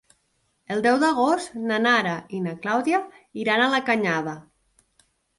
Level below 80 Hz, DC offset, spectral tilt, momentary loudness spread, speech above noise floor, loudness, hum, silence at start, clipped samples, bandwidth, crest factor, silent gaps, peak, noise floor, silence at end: -68 dBFS; under 0.1%; -4.5 dB/octave; 10 LU; 47 dB; -23 LUFS; none; 0.7 s; under 0.1%; 11.5 kHz; 18 dB; none; -6 dBFS; -70 dBFS; 1 s